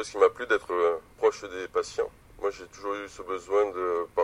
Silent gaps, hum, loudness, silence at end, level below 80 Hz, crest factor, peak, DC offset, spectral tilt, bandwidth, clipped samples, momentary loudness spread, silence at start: none; none; -29 LUFS; 0 s; -58 dBFS; 20 dB; -8 dBFS; under 0.1%; -3.5 dB/octave; 11.5 kHz; under 0.1%; 11 LU; 0 s